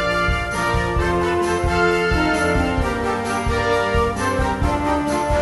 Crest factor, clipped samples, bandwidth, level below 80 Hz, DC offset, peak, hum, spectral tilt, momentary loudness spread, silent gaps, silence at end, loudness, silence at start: 14 dB; under 0.1%; 11.5 kHz; -28 dBFS; under 0.1%; -4 dBFS; none; -5.5 dB/octave; 3 LU; none; 0 s; -19 LUFS; 0 s